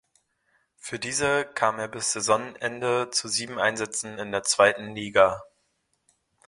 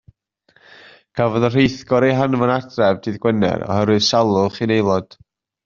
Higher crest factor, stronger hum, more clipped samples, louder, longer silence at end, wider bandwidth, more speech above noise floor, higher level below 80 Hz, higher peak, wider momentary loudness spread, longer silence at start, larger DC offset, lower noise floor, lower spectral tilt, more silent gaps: first, 24 dB vs 16 dB; neither; neither; second, -25 LUFS vs -17 LUFS; first, 1.05 s vs 0.6 s; first, 11.5 kHz vs 7.6 kHz; first, 48 dB vs 42 dB; second, -62 dBFS vs -52 dBFS; about the same, -4 dBFS vs -2 dBFS; first, 11 LU vs 5 LU; second, 0.85 s vs 1.15 s; neither; first, -73 dBFS vs -59 dBFS; second, -2 dB/octave vs -5 dB/octave; neither